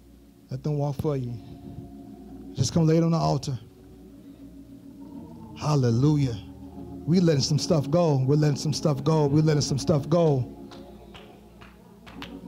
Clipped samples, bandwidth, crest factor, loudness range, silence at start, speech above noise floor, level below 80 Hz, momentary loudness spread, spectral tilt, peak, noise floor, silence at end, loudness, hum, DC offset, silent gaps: under 0.1%; 12 kHz; 14 dB; 5 LU; 0.5 s; 29 dB; -52 dBFS; 23 LU; -6.5 dB/octave; -12 dBFS; -52 dBFS; 0 s; -24 LUFS; none; under 0.1%; none